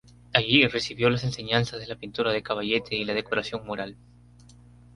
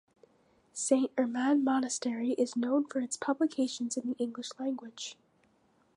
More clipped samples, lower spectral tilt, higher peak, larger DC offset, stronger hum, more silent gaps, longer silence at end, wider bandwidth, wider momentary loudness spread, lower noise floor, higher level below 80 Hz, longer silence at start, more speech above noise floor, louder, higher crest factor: neither; first, -5 dB/octave vs -3 dB/octave; first, -2 dBFS vs -14 dBFS; neither; first, 60 Hz at -45 dBFS vs none; neither; first, 1.05 s vs 0.85 s; about the same, 11.5 kHz vs 11.5 kHz; first, 14 LU vs 10 LU; second, -52 dBFS vs -69 dBFS; first, -54 dBFS vs -84 dBFS; second, 0.3 s vs 0.75 s; second, 26 dB vs 38 dB; first, -25 LUFS vs -32 LUFS; first, 26 dB vs 20 dB